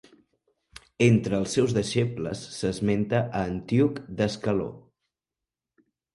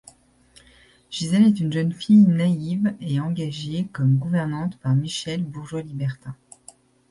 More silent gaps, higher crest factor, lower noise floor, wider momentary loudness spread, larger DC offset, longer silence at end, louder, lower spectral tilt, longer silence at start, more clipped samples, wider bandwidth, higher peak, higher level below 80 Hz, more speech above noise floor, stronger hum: neither; about the same, 20 dB vs 16 dB; first, -89 dBFS vs -55 dBFS; second, 9 LU vs 14 LU; neither; first, 1.35 s vs 0.75 s; second, -26 LUFS vs -22 LUFS; about the same, -6.5 dB/octave vs -7 dB/octave; about the same, 1 s vs 1.1 s; neither; about the same, 11.5 kHz vs 11.5 kHz; about the same, -6 dBFS vs -6 dBFS; first, -54 dBFS vs -60 dBFS; first, 64 dB vs 34 dB; neither